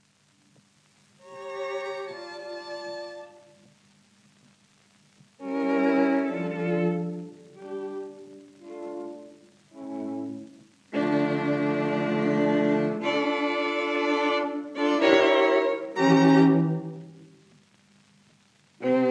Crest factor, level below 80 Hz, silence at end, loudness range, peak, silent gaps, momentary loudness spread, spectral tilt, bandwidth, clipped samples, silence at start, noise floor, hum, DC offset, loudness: 22 dB; -80 dBFS; 0 s; 16 LU; -4 dBFS; none; 21 LU; -6.5 dB/octave; 9.2 kHz; under 0.1%; 1.25 s; -63 dBFS; none; under 0.1%; -25 LUFS